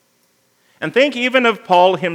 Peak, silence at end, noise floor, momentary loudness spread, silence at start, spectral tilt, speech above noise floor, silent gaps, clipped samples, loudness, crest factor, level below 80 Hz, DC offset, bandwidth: 0 dBFS; 0 s; -60 dBFS; 6 LU; 0.8 s; -5 dB/octave; 46 dB; none; under 0.1%; -14 LUFS; 16 dB; -80 dBFS; under 0.1%; 12 kHz